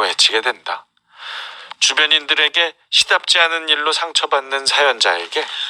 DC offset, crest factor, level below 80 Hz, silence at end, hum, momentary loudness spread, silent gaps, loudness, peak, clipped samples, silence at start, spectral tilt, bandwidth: under 0.1%; 18 dB; -68 dBFS; 0 s; none; 16 LU; none; -14 LUFS; 0 dBFS; under 0.1%; 0 s; 2 dB/octave; 19.5 kHz